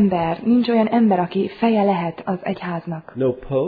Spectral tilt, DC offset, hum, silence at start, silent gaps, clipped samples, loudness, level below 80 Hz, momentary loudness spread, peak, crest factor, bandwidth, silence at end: -10.5 dB/octave; under 0.1%; none; 0 s; none; under 0.1%; -20 LUFS; -52 dBFS; 10 LU; -6 dBFS; 14 dB; 4.9 kHz; 0 s